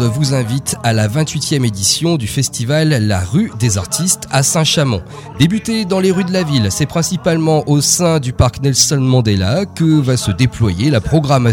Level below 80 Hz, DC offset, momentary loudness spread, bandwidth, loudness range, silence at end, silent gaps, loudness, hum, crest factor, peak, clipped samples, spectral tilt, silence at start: -36 dBFS; under 0.1%; 5 LU; 17 kHz; 2 LU; 0 s; none; -14 LUFS; none; 14 dB; 0 dBFS; under 0.1%; -4.5 dB/octave; 0 s